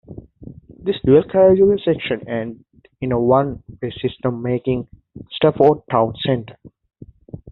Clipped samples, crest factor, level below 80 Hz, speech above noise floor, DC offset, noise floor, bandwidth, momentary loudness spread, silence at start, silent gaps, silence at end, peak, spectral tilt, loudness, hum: under 0.1%; 18 dB; -48 dBFS; 23 dB; under 0.1%; -40 dBFS; 4.2 kHz; 16 LU; 0.1 s; none; 0 s; -2 dBFS; -6 dB/octave; -18 LUFS; none